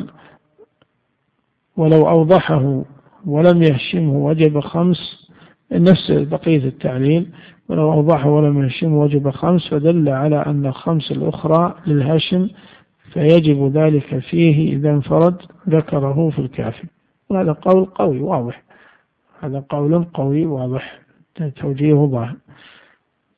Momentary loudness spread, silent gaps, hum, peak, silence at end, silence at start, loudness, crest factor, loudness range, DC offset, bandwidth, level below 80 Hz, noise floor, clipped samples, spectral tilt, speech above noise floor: 14 LU; none; none; 0 dBFS; 1 s; 0 s; -16 LUFS; 16 dB; 5 LU; under 0.1%; 4.9 kHz; -50 dBFS; -67 dBFS; under 0.1%; -10.5 dB/octave; 52 dB